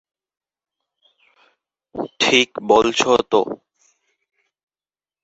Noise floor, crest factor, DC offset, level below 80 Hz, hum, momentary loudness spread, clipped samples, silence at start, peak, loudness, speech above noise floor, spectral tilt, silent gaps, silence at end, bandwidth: under -90 dBFS; 22 dB; under 0.1%; -56 dBFS; none; 16 LU; under 0.1%; 1.95 s; 0 dBFS; -17 LUFS; over 73 dB; -2.5 dB/octave; none; 1.7 s; 8 kHz